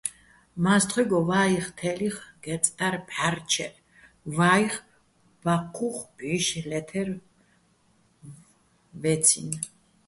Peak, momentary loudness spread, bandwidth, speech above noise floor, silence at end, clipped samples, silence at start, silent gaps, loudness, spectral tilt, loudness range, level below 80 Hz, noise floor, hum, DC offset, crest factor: -4 dBFS; 14 LU; 12 kHz; 39 dB; 0.4 s; under 0.1%; 0.05 s; none; -26 LUFS; -3.5 dB/octave; 6 LU; -62 dBFS; -64 dBFS; none; under 0.1%; 22 dB